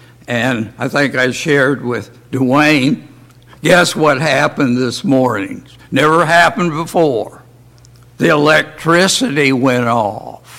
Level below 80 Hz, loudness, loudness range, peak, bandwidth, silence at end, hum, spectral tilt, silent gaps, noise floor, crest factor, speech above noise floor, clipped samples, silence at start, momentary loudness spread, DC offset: -50 dBFS; -13 LUFS; 2 LU; 0 dBFS; 16.5 kHz; 0 s; none; -4.5 dB/octave; none; -43 dBFS; 14 dB; 29 dB; under 0.1%; 0.3 s; 11 LU; under 0.1%